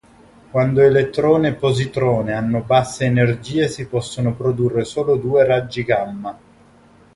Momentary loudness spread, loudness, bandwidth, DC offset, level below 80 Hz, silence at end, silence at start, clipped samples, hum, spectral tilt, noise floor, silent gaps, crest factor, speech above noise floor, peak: 9 LU; -18 LUFS; 11.5 kHz; under 0.1%; -48 dBFS; 0.85 s; 0.55 s; under 0.1%; none; -6.5 dB/octave; -49 dBFS; none; 16 dB; 32 dB; -2 dBFS